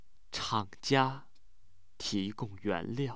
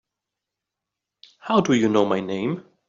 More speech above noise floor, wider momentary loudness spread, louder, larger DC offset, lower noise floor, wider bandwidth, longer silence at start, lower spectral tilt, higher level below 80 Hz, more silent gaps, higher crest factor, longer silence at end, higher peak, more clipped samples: second, 34 dB vs 64 dB; about the same, 11 LU vs 9 LU; second, -34 LUFS vs -21 LUFS; first, 0.4% vs under 0.1%; second, -67 dBFS vs -85 dBFS; about the same, 8 kHz vs 7.6 kHz; second, 0.3 s vs 1.45 s; about the same, -5 dB/octave vs -5 dB/octave; about the same, -62 dBFS vs -64 dBFS; neither; about the same, 22 dB vs 20 dB; second, 0 s vs 0.25 s; second, -14 dBFS vs -4 dBFS; neither